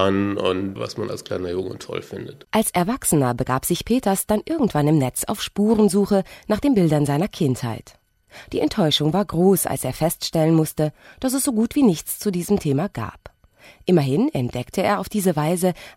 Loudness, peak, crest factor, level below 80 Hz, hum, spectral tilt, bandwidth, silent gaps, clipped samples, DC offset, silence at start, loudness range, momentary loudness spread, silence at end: -21 LUFS; -4 dBFS; 18 dB; -48 dBFS; none; -5.5 dB/octave; 16.5 kHz; none; under 0.1%; under 0.1%; 0 s; 3 LU; 10 LU; 0.05 s